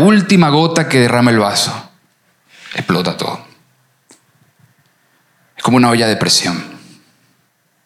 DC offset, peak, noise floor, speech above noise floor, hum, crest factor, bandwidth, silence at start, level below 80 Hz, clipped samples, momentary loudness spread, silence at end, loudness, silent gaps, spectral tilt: under 0.1%; 0 dBFS; -60 dBFS; 48 dB; none; 16 dB; 15 kHz; 0 s; -58 dBFS; under 0.1%; 15 LU; 1.1 s; -13 LUFS; none; -4.5 dB/octave